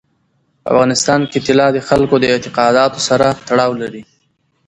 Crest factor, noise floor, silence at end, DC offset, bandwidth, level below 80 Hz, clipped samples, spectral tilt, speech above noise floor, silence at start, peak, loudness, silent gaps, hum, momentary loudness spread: 14 dB; -62 dBFS; 0.65 s; under 0.1%; 11.5 kHz; -46 dBFS; under 0.1%; -4.5 dB/octave; 49 dB; 0.65 s; 0 dBFS; -13 LUFS; none; none; 5 LU